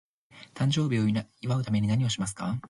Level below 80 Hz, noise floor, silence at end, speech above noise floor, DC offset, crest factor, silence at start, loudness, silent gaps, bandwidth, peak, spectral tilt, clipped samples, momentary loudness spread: -56 dBFS; -54 dBFS; 0.05 s; 27 dB; under 0.1%; 14 dB; 0.35 s; -28 LUFS; none; 11.5 kHz; -14 dBFS; -6 dB/octave; under 0.1%; 6 LU